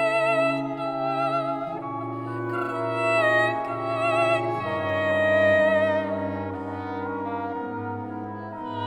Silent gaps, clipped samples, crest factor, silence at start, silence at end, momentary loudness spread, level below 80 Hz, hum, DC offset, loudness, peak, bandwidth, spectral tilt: none; under 0.1%; 14 dB; 0 s; 0 s; 12 LU; -66 dBFS; none; under 0.1%; -25 LUFS; -10 dBFS; 10.5 kHz; -6.5 dB/octave